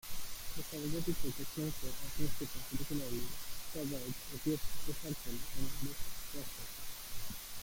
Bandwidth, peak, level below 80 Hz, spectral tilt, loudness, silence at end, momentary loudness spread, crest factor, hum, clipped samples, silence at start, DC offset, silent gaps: 17 kHz; -20 dBFS; -50 dBFS; -4 dB/octave; -42 LUFS; 0 s; 6 LU; 16 dB; none; under 0.1%; 0.05 s; under 0.1%; none